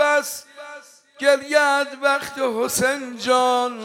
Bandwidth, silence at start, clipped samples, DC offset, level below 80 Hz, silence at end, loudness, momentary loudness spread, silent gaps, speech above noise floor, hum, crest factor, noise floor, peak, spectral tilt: 17 kHz; 0 s; under 0.1%; under 0.1%; -64 dBFS; 0 s; -20 LUFS; 16 LU; none; 23 dB; none; 16 dB; -43 dBFS; -4 dBFS; -2 dB/octave